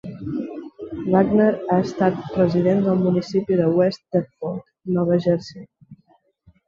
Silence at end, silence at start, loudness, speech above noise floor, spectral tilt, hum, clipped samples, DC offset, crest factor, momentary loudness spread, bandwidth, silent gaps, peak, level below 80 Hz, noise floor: 0.75 s; 0.05 s; -21 LUFS; 41 dB; -8.5 dB/octave; none; under 0.1%; under 0.1%; 18 dB; 13 LU; 7.2 kHz; none; -4 dBFS; -54 dBFS; -60 dBFS